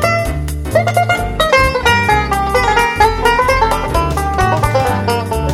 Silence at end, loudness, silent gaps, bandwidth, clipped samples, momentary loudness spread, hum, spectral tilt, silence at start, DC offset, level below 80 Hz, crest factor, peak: 0 s; -13 LUFS; none; 16.5 kHz; under 0.1%; 5 LU; none; -4.5 dB/octave; 0 s; under 0.1%; -24 dBFS; 14 dB; 0 dBFS